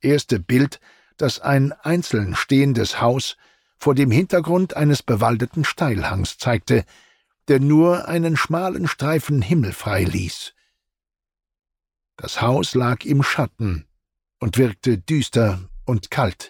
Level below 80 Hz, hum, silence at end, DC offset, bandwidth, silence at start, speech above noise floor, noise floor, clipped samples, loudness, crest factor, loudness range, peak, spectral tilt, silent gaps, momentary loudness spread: -44 dBFS; none; 0 s; under 0.1%; 17 kHz; 0.05 s; 68 dB; -87 dBFS; under 0.1%; -20 LUFS; 14 dB; 5 LU; -6 dBFS; -6 dB/octave; none; 9 LU